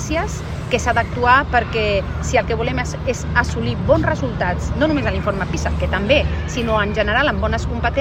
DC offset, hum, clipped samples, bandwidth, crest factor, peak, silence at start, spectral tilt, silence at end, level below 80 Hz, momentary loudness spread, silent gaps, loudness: under 0.1%; none; under 0.1%; 9.6 kHz; 18 dB; 0 dBFS; 0 s; -5.5 dB/octave; 0 s; -26 dBFS; 6 LU; none; -19 LUFS